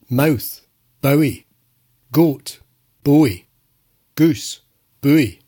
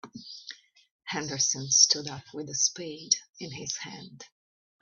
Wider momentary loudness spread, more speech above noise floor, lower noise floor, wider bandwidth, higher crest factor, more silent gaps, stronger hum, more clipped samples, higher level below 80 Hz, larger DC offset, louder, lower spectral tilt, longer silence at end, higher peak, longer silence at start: second, 19 LU vs 23 LU; first, 47 dB vs 19 dB; first, -63 dBFS vs -49 dBFS; first, 18 kHz vs 9.2 kHz; second, 16 dB vs 26 dB; second, none vs 0.91-0.99 s, 3.29-3.33 s; neither; neither; first, -54 dBFS vs -72 dBFS; neither; first, -18 LUFS vs -26 LUFS; first, -6.5 dB/octave vs -0.5 dB/octave; second, 0.15 s vs 0.55 s; first, -2 dBFS vs -6 dBFS; about the same, 0.1 s vs 0.05 s